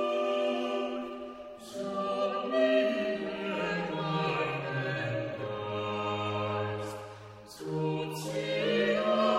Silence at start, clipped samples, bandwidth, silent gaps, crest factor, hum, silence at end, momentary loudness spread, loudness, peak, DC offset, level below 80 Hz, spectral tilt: 0 s; under 0.1%; 15.5 kHz; none; 16 dB; none; 0 s; 13 LU; -32 LUFS; -16 dBFS; under 0.1%; -68 dBFS; -6 dB/octave